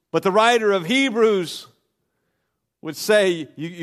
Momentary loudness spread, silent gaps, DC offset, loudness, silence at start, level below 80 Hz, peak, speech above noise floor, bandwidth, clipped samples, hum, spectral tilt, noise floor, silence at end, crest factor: 17 LU; none; under 0.1%; -19 LUFS; 0.15 s; -74 dBFS; -2 dBFS; 56 dB; 15 kHz; under 0.1%; none; -4 dB/octave; -76 dBFS; 0 s; 18 dB